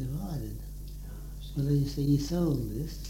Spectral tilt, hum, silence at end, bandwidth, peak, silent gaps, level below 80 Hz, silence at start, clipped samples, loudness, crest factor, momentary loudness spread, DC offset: -7.5 dB/octave; none; 0 s; 17 kHz; -16 dBFS; none; -40 dBFS; 0 s; under 0.1%; -31 LUFS; 16 dB; 16 LU; under 0.1%